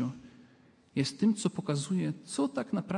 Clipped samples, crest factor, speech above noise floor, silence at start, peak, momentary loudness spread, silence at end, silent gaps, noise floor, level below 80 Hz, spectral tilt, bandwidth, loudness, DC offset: under 0.1%; 16 dB; 30 dB; 0 s; -16 dBFS; 9 LU; 0 s; none; -61 dBFS; -74 dBFS; -5.5 dB/octave; 11.5 kHz; -32 LUFS; under 0.1%